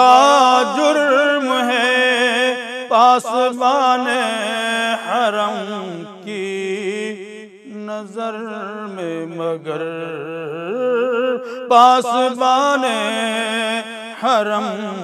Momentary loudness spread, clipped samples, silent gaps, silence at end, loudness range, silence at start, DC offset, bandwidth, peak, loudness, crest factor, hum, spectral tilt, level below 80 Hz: 15 LU; under 0.1%; none; 0 s; 11 LU; 0 s; under 0.1%; 14 kHz; 0 dBFS; -17 LUFS; 16 dB; none; -3 dB/octave; -76 dBFS